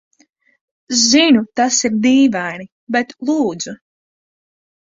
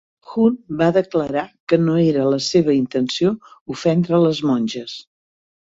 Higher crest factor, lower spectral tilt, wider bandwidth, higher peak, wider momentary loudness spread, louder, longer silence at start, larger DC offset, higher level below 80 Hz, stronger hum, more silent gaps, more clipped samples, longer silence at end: about the same, 16 dB vs 16 dB; second, -2.5 dB/octave vs -6.5 dB/octave; about the same, 7.8 kHz vs 7.8 kHz; about the same, 0 dBFS vs -2 dBFS; first, 15 LU vs 12 LU; first, -15 LUFS vs -18 LUFS; first, 0.9 s vs 0.3 s; neither; about the same, -58 dBFS vs -58 dBFS; neither; about the same, 2.72-2.87 s vs 1.60-1.67 s, 3.61-3.66 s; neither; first, 1.2 s vs 0.65 s